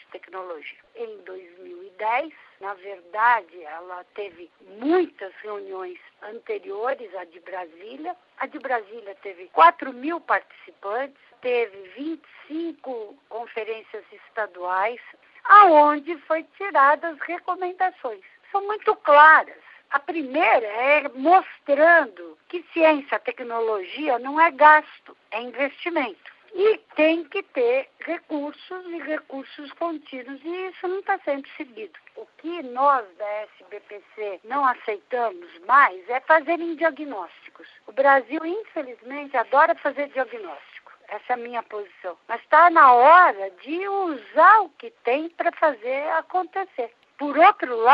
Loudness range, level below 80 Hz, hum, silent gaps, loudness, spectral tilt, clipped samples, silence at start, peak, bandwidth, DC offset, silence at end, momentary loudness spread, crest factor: 13 LU; -86 dBFS; none; none; -20 LUFS; -5.5 dB/octave; under 0.1%; 0.15 s; 0 dBFS; 5.4 kHz; under 0.1%; 0 s; 22 LU; 22 dB